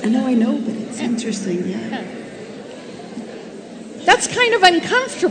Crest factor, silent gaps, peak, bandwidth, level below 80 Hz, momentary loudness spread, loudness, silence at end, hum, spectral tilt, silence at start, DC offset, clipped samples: 20 dB; none; 0 dBFS; 11 kHz; -58 dBFS; 21 LU; -17 LUFS; 0 s; none; -3.5 dB/octave; 0 s; under 0.1%; under 0.1%